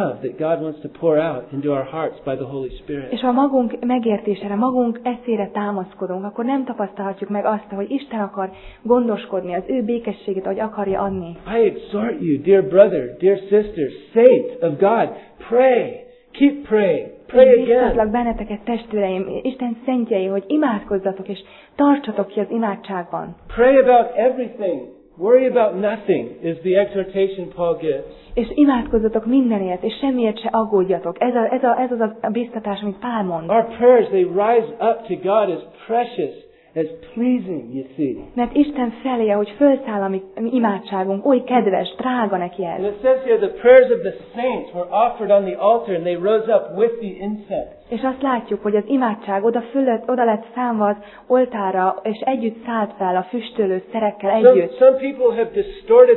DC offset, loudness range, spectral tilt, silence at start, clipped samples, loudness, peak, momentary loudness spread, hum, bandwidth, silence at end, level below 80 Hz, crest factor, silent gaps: under 0.1%; 6 LU; -11 dB/octave; 0 s; under 0.1%; -19 LUFS; 0 dBFS; 12 LU; none; 4.2 kHz; 0 s; -48 dBFS; 18 dB; none